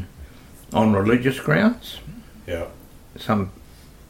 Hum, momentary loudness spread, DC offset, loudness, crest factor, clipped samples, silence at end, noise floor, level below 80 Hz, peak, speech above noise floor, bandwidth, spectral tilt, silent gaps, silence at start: none; 19 LU; under 0.1%; -22 LUFS; 18 dB; under 0.1%; 0.5 s; -45 dBFS; -46 dBFS; -4 dBFS; 25 dB; 16.5 kHz; -7 dB/octave; none; 0 s